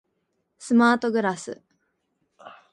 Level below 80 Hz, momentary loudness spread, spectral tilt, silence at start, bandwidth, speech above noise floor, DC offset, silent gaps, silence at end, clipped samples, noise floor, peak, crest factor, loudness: -72 dBFS; 23 LU; -5 dB/octave; 0.6 s; 11 kHz; 53 dB; under 0.1%; none; 0.2 s; under 0.1%; -75 dBFS; -6 dBFS; 20 dB; -21 LUFS